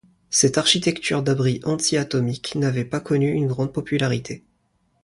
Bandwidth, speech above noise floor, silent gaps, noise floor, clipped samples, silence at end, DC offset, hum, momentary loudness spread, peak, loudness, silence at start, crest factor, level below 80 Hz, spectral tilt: 11.5 kHz; 45 dB; none; -67 dBFS; under 0.1%; 0.65 s; under 0.1%; none; 8 LU; -4 dBFS; -21 LUFS; 0.3 s; 18 dB; -56 dBFS; -4 dB/octave